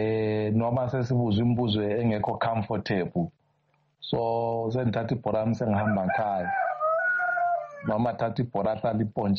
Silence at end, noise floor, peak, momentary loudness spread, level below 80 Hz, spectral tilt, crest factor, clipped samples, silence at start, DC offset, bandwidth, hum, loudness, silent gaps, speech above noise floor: 0 s; -69 dBFS; -14 dBFS; 5 LU; -58 dBFS; -6 dB/octave; 12 dB; under 0.1%; 0 s; under 0.1%; 6.6 kHz; none; -27 LUFS; none; 43 dB